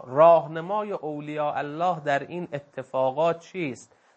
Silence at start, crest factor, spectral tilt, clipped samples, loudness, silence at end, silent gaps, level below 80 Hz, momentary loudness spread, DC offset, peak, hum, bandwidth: 0 s; 20 dB; -6.5 dB/octave; under 0.1%; -25 LUFS; 0.35 s; none; -76 dBFS; 16 LU; under 0.1%; -6 dBFS; none; 8.6 kHz